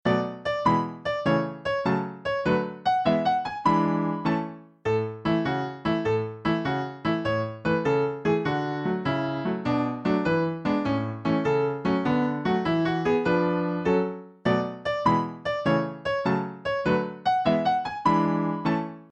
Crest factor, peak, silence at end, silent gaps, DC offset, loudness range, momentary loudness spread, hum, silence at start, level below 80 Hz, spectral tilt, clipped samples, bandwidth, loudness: 16 dB; -8 dBFS; 0.05 s; none; under 0.1%; 2 LU; 5 LU; none; 0.05 s; -54 dBFS; -7.5 dB/octave; under 0.1%; 8.6 kHz; -26 LUFS